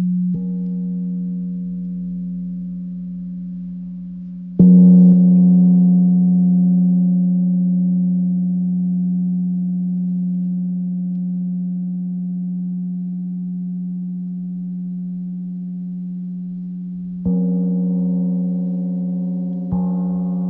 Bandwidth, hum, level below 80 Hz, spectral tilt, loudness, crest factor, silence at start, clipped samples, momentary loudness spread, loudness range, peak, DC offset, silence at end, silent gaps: 1.1 kHz; none; -52 dBFS; -15.5 dB/octave; -18 LUFS; 16 dB; 0 s; under 0.1%; 16 LU; 14 LU; -2 dBFS; under 0.1%; 0 s; none